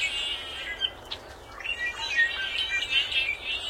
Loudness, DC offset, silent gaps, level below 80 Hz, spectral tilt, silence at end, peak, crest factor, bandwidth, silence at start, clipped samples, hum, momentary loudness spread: -27 LUFS; under 0.1%; none; -52 dBFS; -0.5 dB/octave; 0 s; -12 dBFS; 18 dB; 16.5 kHz; 0 s; under 0.1%; none; 14 LU